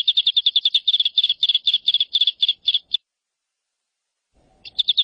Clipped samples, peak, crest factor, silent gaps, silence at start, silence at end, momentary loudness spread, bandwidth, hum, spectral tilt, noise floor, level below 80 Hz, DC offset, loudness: under 0.1%; -6 dBFS; 16 dB; none; 0.05 s; 0 s; 6 LU; 10 kHz; none; 2 dB/octave; -82 dBFS; -68 dBFS; under 0.1%; -17 LUFS